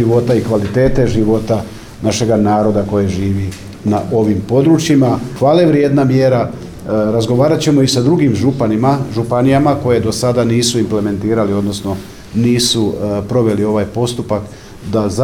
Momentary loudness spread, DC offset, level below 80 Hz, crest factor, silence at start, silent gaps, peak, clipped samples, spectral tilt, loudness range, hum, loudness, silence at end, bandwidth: 8 LU; under 0.1%; -36 dBFS; 12 dB; 0 s; none; 0 dBFS; under 0.1%; -6 dB/octave; 3 LU; none; -14 LUFS; 0 s; 18 kHz